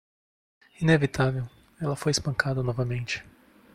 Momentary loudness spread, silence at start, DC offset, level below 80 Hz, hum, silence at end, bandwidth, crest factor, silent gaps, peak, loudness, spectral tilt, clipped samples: 12 LU; 0.8 s; under 0.1%; -52 dBFS; none; 0.45 s; 14 kHz; 20 dB; none; -8 dBFS; -27 LUFS; -5.5 dB/octave; under 0.1%